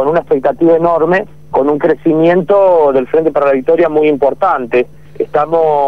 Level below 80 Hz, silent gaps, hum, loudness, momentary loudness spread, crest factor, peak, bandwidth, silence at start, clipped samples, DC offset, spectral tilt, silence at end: -48 dBFS; none; none; -11 LUFS; 6 LU; 8 dB; -2 dBFS; 5.8 kHz; 0 s; under 0.1%; 2%; -8.5 dB/octave; 0 s